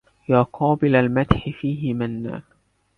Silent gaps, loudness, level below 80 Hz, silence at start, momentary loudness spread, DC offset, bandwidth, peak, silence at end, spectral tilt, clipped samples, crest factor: none; -21 LUFS; -40 dBFS; 0.3 s; 12 LU; under 0.1%; 4.6 kHz; 0 dBFS; 0.55 s; -9.5 dB/octave; under 0.1%; 20 dB